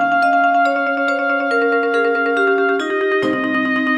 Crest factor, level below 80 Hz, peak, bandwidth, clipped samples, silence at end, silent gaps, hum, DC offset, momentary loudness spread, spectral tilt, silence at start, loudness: 10 dB; -64 dBFS; -6 dBFS; 10.5 kHz; under 0.1%; 0 s; none; none; under 0.1%; 3 LU; -5 dB/octave; 0 s; -16 LUFS